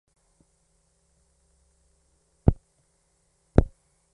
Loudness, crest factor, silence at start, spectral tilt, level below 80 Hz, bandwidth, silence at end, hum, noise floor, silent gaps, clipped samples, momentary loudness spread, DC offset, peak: -26 LUFS; 30 dB; 2.45 s; -10 dB/octave; -36 dBFS; 10 kHz; 0.45 s; none; -69 dBFS; none; under 0.1%; 15 LU; under 0.1%; 0 dBFS